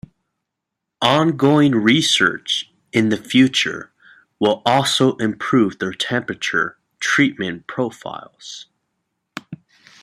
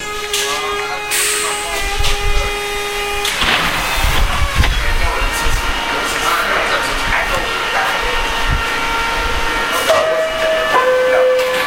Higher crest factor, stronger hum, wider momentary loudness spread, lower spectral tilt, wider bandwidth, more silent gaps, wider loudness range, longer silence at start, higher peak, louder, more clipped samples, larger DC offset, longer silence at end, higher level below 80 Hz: about the same, 18 dB vs 16 dB; neither; first, 20 LU vs 5 LU; first, -4.5 dB/octave vs -2.5 dB/octave; second, 14.5 kHz vs 16 kHz; neither; first, 6 LU vs 1 LU; first, 1 s vs 0 s; about the same, -2 dBFS vs 0 dBFS; second, -18 LUFS vs -15 LUFS; neither; neither; first, 0.45 s vs 0 s; second, -60 dBFS vs -22 dBFS